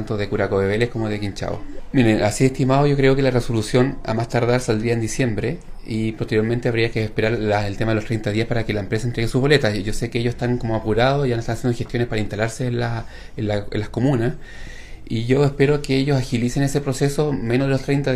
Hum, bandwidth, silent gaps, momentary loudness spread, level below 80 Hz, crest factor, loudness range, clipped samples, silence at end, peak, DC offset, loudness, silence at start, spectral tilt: none; 14 kHz; none; 9 LU; -34 dBFS; 20 dB; 4 LU; under 0.1%; 0 s; 0 dBFS; under 0.1%; -21 LUFS; 0 s; -6.5 dB/octave